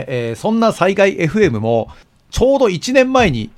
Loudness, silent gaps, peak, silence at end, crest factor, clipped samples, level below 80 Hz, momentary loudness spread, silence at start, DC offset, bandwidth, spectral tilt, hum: -14 LUFS; none; 0 dBFS; 0.1 s; 14 dB; under 0.1%; -36 dBFS; 7 LU; 0 s; under 0.1%; 13.5 kHz; -5.5 dB/octave; none